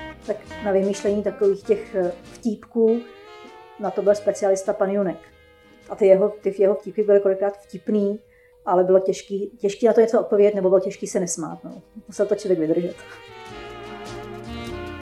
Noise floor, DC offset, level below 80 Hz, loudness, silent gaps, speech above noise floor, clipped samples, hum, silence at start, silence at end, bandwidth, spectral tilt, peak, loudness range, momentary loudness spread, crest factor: -51 dBFS; under 0.1%; -54 dBFS; -21 LUFS; none; 30 dB; under 0.1%; none; 0 s; 0 s; 12 kHz; -6 dB/octave; -2 dBFS; 6 LU; 19 LU; 20 dB